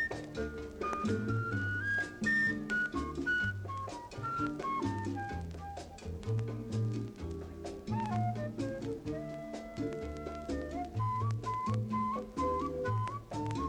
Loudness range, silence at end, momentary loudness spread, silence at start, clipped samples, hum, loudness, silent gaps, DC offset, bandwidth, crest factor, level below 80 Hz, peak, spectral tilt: 5 LU; 0 s; 10 LU; 0 s; under 0.1%; none; -36 LUFS; none; under 0.1%; 10.5 kHz; 14 dB; -52 dBFS; -22 dBFS; -6.5 dB/octave